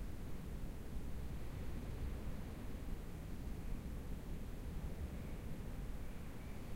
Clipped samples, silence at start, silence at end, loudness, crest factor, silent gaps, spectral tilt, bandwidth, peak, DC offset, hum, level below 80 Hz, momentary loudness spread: under 0.1%; 0 s; 0 s; -49 LUFS; 14 dB; none; -6.5 dB/octave; 16 kHz; -30 dBFS; under 0.1%; none; -48 dBFS; 3 LU